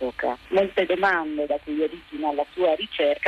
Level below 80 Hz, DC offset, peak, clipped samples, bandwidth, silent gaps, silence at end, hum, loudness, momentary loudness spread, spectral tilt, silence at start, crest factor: -56 dBFS; under 0.1%; -10 dBFS; under 0.1%; 7.8 kHz; none; 0 s; none; -24 LUFS; 6 LU; -5.5 dB/octave; 0 s; 14 dB